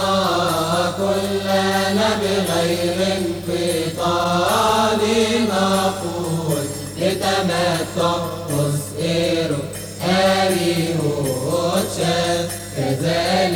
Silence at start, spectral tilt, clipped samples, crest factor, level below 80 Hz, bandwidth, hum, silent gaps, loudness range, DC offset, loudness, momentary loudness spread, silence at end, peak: 0 s; -4.5 dB/octave; under 0.1%; 14 dB; -46 dBFS; over 20 kHz; 50 Hz at -35 dBFS; none; 2 LU; under 0.1%; -19 LUFS; 6 LU; 0 s; -6 dBFS